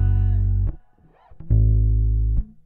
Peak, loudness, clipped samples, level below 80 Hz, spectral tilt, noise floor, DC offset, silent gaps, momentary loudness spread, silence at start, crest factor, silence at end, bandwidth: -8 dBFS; -22 LUFS; under 0.1%; -22 dBFS; -12.5 dB/octave; -54 dBFS; under 0.1%; none; 7 LU; 0 s; 12 dB; 0.2 s; 1.8 kHz